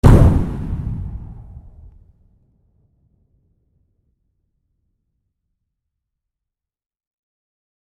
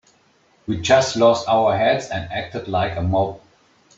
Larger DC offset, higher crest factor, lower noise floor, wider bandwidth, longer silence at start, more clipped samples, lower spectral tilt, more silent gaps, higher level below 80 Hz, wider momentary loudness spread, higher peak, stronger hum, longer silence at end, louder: neither; about the same, 20 dB vs 18 dB; first, -89 dBFS vs -58 dBFS; first, 13 kHz vs 8 kHz; second, 0.05 s vs 0.7 s; neither; first, -9 dB/octave vs -5 dB/octave; neither; first, -26 dBFS vs -50 dBFS; first, 29 LU vs 11 LU; about the same, 0 dBFS vs -2 dBFS; neither; first, 6.4 s vs 0.6 s; about the same, -18 LUFS vs -19 LUFS